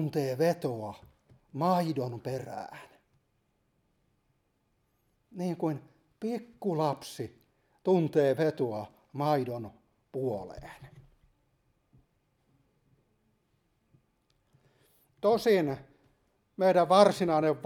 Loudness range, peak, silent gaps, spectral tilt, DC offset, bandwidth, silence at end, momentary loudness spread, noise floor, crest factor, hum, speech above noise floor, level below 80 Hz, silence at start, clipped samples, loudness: 13 LU; -6 dBFS; none; -6.5 dB/octave; under 0.1%; 18 kHz; 0 s; 19 LU; -75 dBFS; 26 dB; none; 46 dB; -68 dBFS; 0 s; under 0.1%; -29 LUFS